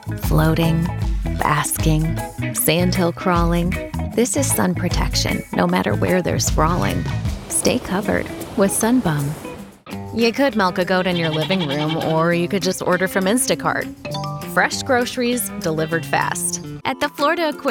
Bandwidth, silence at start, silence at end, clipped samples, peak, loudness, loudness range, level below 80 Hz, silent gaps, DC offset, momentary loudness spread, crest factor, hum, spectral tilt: 18.5 kHz; 0 s; 0 s; under 0.1%; -2 dBFS; -19 LUFS; 2 LU; -32 dBFS; none; under 0.1%; 7 LU; 18 dB; none; -4.5 dB/octave